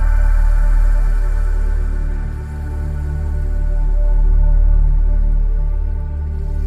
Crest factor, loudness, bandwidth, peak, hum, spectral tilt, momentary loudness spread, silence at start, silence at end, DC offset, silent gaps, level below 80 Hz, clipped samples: 8 dB; -20 LUFS; 2.5 kHz; -6 dBFS; none; -8.5 dB/octave; 7 LU; 0 s; 0 s; under 0.1%; none; -14 dBFS; under 0.1%